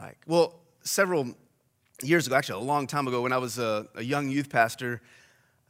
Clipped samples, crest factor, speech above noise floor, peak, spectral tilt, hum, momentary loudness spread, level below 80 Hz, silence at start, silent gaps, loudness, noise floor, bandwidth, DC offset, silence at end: under 0.1%; 20 dB; 41 dB; -8 dBFS; -4.5 dB/octave; none; 10 LU; -74 dBFS; 0 s; none; -27 LUFS; -69 dBFS; 16 kHz; under 0.1%; 0.7 s